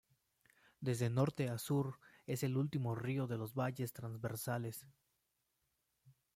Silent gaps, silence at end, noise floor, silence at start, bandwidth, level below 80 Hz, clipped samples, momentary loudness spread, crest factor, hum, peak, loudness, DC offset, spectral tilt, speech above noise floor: none; 0.25 s; -84 dBFS; 0.8 s; 16.5 kHz; -74 dBFS; under 0.1%; 9 LU; 20 dB; none; -22 dBFS; -40 LUFS; under 0.1%; -6.5 dB/octave; 45 dB